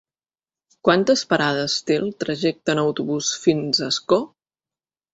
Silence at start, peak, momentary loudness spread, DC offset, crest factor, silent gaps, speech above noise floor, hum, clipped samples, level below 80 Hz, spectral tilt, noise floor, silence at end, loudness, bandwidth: 0.85 s; -2 dBFS; 5 LU; under 0.1%; 20 dB; none; over 70 dB; none; under 0.1%; -62 dBFS; -4 dB/octave; under -90 dBFS; 0.85 s; -21 LUFS; 8 kHz